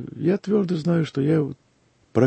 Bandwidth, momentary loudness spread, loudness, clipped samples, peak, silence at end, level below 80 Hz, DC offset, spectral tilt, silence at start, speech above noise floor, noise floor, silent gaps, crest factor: 8.6 kHz; 4 LU; -23 LUFS; under 0.1%; -4 dBFS; 0 s; -62 dBFS; under 0.1%; -8.5 dB/octave; 0 s; 40 dB; -62 dBFS; none; 18 dB